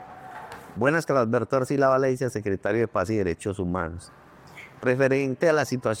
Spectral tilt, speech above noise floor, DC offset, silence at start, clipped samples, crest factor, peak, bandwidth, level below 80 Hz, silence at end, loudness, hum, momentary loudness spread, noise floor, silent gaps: -6.5 dB/octave; 22 dB; under 0.1%; 0 s; under 0.1%; 18 dB; -6 dBFS; 16 kHz; -58 dBFS; 0 s; -24 LUFS; none; 19 LU; -46 dBFS; none